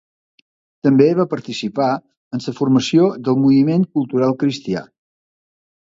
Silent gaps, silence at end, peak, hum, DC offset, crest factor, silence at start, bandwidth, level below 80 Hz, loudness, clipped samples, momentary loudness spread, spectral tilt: 2.17-2.31 s; 1.1 s; 0 dBFS; none; under 0.1%; 18 dB; 0.85 s; 7.8 kHz; -60 dBFS; -17 LUFS; under 0.1%; 12 LU; -7 dB/octave